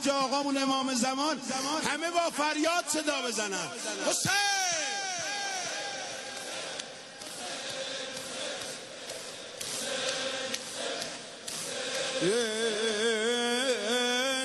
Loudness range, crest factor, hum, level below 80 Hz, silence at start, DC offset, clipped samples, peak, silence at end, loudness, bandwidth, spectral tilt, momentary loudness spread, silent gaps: 8 LU; 20 dB; none; -74 dBFS; 0 s; under 0.1%; under 0.1%; -12 dBFS; 0 s; -30 LUFS; 13 kHz; -1.5 dB/octave; 10 LU; none